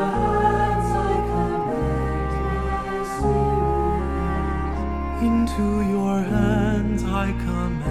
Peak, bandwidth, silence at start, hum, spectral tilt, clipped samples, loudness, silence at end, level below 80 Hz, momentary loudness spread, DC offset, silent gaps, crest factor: -8 dBFS; 13.5 kHz; 0 s; none; -7.5 dB/octave; under 0.1%; -23 LUFS; 0 s; -28 dBFS; 5 LU; under 0.1%; none; 14 dB